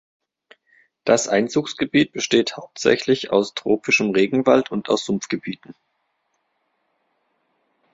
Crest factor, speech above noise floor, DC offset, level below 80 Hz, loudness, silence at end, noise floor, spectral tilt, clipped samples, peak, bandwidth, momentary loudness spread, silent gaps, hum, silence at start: 20 dB; 52 dB; under 0.1%; -62 dBFS; -20 LUFS; 2.2 s; -71 dBFS; -4 dB/octave; under 0.1%; -2 dBFS; 8 kHz; 10 LU; none; none; 1.05 s